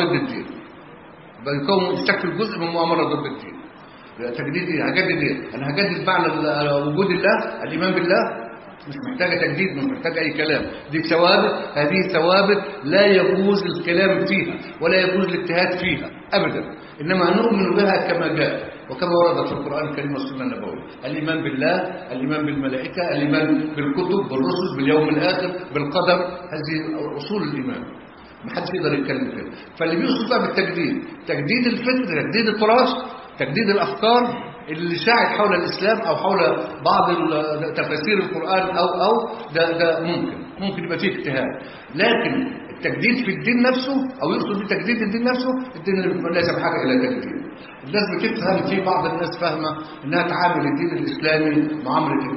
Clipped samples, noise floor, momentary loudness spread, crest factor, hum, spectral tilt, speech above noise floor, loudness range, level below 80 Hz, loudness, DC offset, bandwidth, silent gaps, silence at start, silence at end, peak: under 0.1%; -42 dBFS; 11 LU; 18 dB; none; -10 dB/octave; 22 dB; 5 LU; -56 dBFS; -20 LUFS; under 0.1%; 5.8 kHz; none; 0 s; 0 s; -2 dBFS